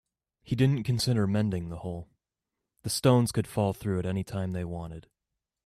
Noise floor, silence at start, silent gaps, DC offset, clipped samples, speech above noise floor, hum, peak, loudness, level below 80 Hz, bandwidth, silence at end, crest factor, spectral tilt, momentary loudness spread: -87 dBFS; 0.45 s; none; under 0.1%; under 0.1%; 59 dB; none; -10 dBFS; -29 LUFS; -56 dBFS; 14.5 kHz; 0.65 s; 20 dB; -6 dB/octave; 15 LU